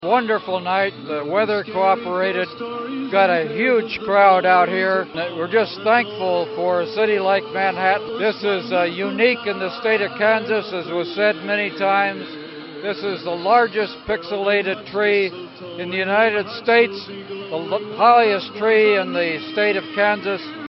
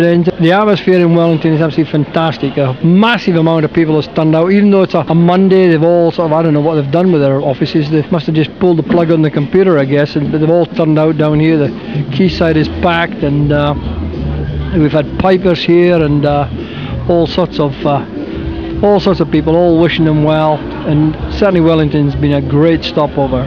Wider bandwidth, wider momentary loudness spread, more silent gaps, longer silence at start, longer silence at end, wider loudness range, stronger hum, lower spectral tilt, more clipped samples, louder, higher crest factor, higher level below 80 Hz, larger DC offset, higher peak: first, 6 kHz vs 5.4 kHz; first, 10 LU vs 6 LU; neither; about the same, 0 s vs 0 s; about the same, 0 s vs 0 s; about the same, 3 LU vs 3 LU; neither; second, -2 dB/octave vs -9 dB/octave; second, under 0.1% vs 0.6%; second, -19 LUFS vs -11 LUFS; first, 18 dB vs 10 dB; second, -62 dBFS vs -30 dBFS; second, under 0.1% vs 0.4%; about the same, -2 dBFS vs 0 dBFS